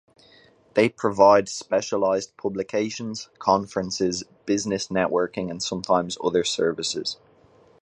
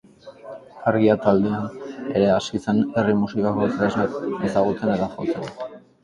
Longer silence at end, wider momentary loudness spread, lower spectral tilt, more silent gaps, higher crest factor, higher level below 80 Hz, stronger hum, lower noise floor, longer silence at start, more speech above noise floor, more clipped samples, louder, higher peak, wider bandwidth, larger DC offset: first, 0.65 s vs 0.25 s; second, 10 LU vs 16 LU; second, -4 dB/octave vs -7 dB/octave; neither; about the same, 22 dB vs 20 dB; second, -60 dBFS vs -54 dBFS; neither; first, -56 dBFS vs -42 dBFS; first, 0.75 s vs 0.25 s; first, 32 dB vs 21 dB; neither; about the same, -24 LUFS vs -22 LUFS; about the same, -2 dBFS vs -2 dBFS; first, 10.5 kHz vs 9.4 kHz; neither